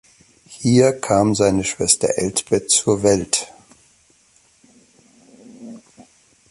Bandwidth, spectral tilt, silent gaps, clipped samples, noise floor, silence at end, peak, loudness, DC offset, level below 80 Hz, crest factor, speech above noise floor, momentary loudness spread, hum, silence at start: 12 kHz; -4 dB/octave; none; under 0.1%; -56 dBFS; 0.7 s; 0 dBFS; -17 LUFS; under 0.1%; -48 dBFS; 20 dB; 39 dB; 17 LU; none; 0.5 s